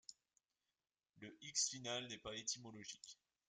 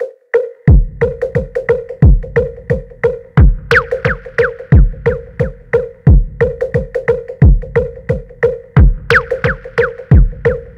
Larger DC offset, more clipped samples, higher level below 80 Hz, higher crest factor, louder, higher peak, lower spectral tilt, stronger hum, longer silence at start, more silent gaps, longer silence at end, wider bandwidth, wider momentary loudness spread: neither; second, under 0.1% vs 0.1%; second, -82 dBFS vs -16 dBFS; first, 24 dB vs 12 dB; second, -45 LUFS vs -14 LUFS; second, -26 dBFS vs 0 dBFS; second, -1 dB/octave vs -8.5 dB/octave; neither; about the same, 0.1 s vs 0 s; neither; first, 0.35 s vs 0.05 s; first, 11.5 kHz vs 8.4 kHz; first, 20 LU vs 7 LU